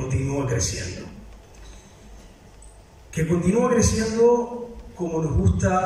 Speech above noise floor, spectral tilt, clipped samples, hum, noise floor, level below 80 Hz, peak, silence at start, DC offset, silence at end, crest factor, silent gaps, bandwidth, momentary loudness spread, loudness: 26 dB; -5.5 dB/octave; under 0.1%; none; -46 dBFS; -38 dBFS; -6 dBFS; 0 s; under 0.1%; 0 s; 16 dB; none; 14 kHz; 15 LU; -22 LUFS